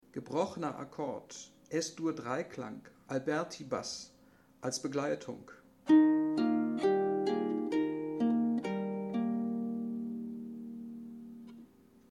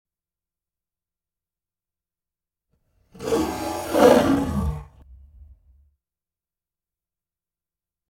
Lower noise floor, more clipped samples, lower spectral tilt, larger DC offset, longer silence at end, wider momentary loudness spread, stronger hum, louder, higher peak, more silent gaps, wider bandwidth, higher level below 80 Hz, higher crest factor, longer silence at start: second, -62 dBFS vs under -90 dBFS; neither; about the same, -5.5 dB/octave vs -5.5 dB/octave; neither; second, 0.45 s vs 2.95 s; about the same, 16 LU vs 16 LU; neither; second, -34 LUFS vs -20 LUFS; second, -14 dBFS vs -2 dBFS; neither; second, 11.5 kHz vs 17 kHz; second, -76 dBFS vs -42 dBFS; second, 20 dB vs 26 dB; second, 0.15 s vs 3.15 s